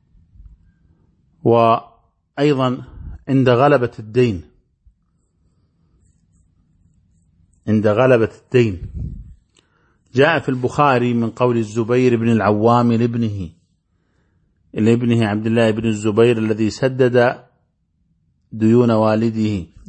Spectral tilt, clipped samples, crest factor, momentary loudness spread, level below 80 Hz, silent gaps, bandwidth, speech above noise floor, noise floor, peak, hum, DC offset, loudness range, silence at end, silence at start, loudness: -7.5 dB/octave; under 0.1%; 18 dB; 15 LU; -44 dBFS; none; 8.6 kHz; 49 dB; -65 dBFS; -2 dBFS; none; under 0.1%; 4 LU; 0.25 s; 0.4 s; -16 LUFS